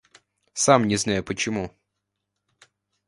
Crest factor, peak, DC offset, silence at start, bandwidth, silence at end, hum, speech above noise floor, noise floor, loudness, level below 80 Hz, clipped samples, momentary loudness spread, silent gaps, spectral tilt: 24 dB; -2 dBFS; under 0.1%; 0.55 s; 11.5 kHz; 1.4 s; 50 Hz at -50 dBFS; 58 dB; -80 dBFS; -22 LUFS; -54 dBFS; under 0.1%; 16 LU; none; -4 dB/octave